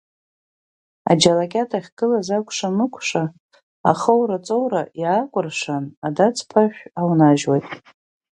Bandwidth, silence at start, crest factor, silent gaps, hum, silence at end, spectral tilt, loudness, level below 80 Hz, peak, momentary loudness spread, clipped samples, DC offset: 11 kHz; 1.05 s; 20 dB; 1.92-1.97 s, 3.40-3.49 s, 3.63-3.84 s, 5.97-6.02 s; none; 0.6 s; -5 dB/octave; -20 LUFS; -62 dBFS; 0 dBFS; 10 LU; under 0.1%; under 0.1%